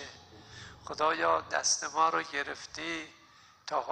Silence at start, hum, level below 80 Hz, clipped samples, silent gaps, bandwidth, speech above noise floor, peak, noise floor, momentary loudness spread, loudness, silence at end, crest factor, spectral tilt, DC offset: 0 s; none; -68 dBFS; under 0.1%; none; 10.5 kHz; 28 dB; -14 dBFS; -59 dBFS; 20 LU; -31 LUFS; 0 s; 20 dB; -1 dB/octave; under 0.1%